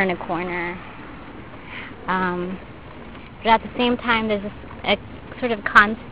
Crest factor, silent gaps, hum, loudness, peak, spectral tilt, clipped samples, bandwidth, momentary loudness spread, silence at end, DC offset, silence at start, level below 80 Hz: 24 dB; none; none; -21 LUFS; 0 dBFS; -6 dB/octave; under 0.1%; 10 kHz; 23 LU; 0 s; 0.6%; 0 s; -46 dBFS